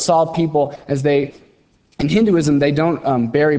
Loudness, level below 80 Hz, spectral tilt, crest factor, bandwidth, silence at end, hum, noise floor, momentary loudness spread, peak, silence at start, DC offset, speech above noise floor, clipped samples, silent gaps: -17 LUFS; -46 dBFS; -6 dB/octave; 14 dB; 8 kHz; 0 s; none; -56 dBFS; 6 LU; -2 dBFS; 0 s; under 0.1%; 40 dB; under 0.1%; none